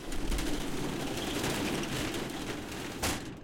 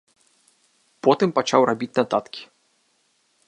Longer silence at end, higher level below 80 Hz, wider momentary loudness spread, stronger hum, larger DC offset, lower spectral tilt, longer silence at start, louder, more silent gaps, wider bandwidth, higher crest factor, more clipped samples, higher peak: second, 0 s vs 1.05 s; first, -42 dBFS vs -72 dBFS; second, 6 LU vs 12 LU; neither; neither; about the same, -4 dB/octave vs -5 dB/octave; second, 0 s vs 1.05 s; second, -35 LUFS vs -21 LUFS; neither; first, 17 kHz vs 11 kHz; second, 14 dB vs 22 dB; neither; second, -20 dBFS vs -2 dBFS